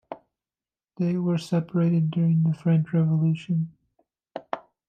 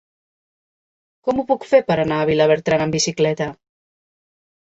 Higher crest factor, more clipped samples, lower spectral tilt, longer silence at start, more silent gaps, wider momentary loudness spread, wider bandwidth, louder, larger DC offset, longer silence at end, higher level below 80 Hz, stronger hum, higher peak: about the same, 14 dB vs 18 dB; neither; first, -9 dB/octave vs -4.5 dB/octave; second, 0.1 s vs 1.25 s; neither; first, 16 LU vs 8 LU; second, 7.2 kHz vs 8.2 kHz; second, -24 LUFS vs -18 LUFS; neither; second, 0.3 s vs 1.2 s; second, -70 dBFS vs -54 dBFS; neither; second, -10 dBFS vs -2 dBFS